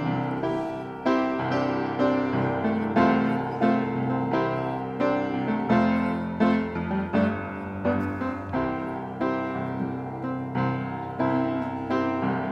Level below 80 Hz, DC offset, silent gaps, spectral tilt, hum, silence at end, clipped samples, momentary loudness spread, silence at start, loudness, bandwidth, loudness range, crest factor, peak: -56 dBFS; under 0.1%; none; -8.5 dB/octave; none; 0 s; under 0.1%; 8 LU; 0 s; -26 LUFS; 7 kHz; 4 LU; 18 dB; -8 dBFS